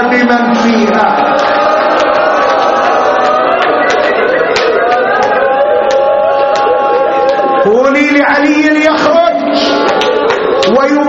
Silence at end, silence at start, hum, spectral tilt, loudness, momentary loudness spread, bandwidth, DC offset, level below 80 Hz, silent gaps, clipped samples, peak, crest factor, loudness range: 0 s; 0 s; none; -4.5 dB/octave; -9 LUFS; 2 LU; 8 kHz; under 0.1%; -46 dBFS; none; 0.1%; 0 dBFS; 8 dB; 1 LU